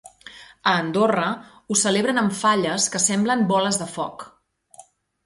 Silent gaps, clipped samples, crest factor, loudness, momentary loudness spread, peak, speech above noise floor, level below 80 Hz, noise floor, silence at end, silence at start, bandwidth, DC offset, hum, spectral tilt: none; under 0.1%; 18 dB; -21 LUFS; 14 LU; -4 dBFS; 30 dB; -64 dBFS; -51 dBFS; 0.45 s; 0.25 s; 11.5 kHz; under 0.1%; none; -3 dB/octave